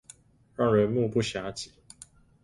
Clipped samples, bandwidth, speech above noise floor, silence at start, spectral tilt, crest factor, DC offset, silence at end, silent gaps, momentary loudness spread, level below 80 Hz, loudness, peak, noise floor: under 0.1%; 11.5 kHz; 29 dB; 0.6 s; -6 dB/octave; 18 dB; under 0.1%; 0.75 s; none; 25 LU; -58 dBFS; -27 LUFS; -10 dBFS; -55 dBFS